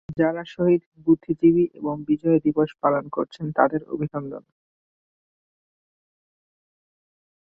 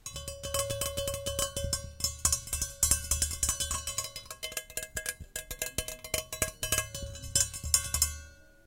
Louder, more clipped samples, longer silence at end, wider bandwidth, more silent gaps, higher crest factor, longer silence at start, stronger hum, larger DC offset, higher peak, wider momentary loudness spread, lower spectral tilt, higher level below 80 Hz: first, -23 LUFS vs -31 LUFS; neither; first, 3 s vs 0.2 s; second, 5.2 kHz vs 17 kHz; first, 0.86-0.92 s vs none; second, 22 dB vs 28 dB; about the same, 0.1 s vs 0.05 s; neither; neither; about the same, -2 dBFS vs -4 dBFS; about the same, 11 LU vs 12 LU; first, -10 dB/octave vs -1.5 dB/octave; second, -62 dBFS vs -44 dBFS